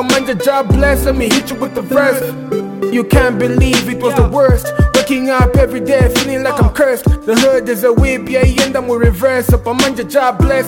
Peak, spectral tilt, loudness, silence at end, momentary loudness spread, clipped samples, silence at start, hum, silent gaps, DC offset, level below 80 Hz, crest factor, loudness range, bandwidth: 0 dBFS; -5.5 dB/octave; -13 LUFS; 0 s; 4 LU; under 0.1%; 0 s; none; none; under 0.1%; -20 dBFS; 12 dB; 1 LU; 17.5 kHz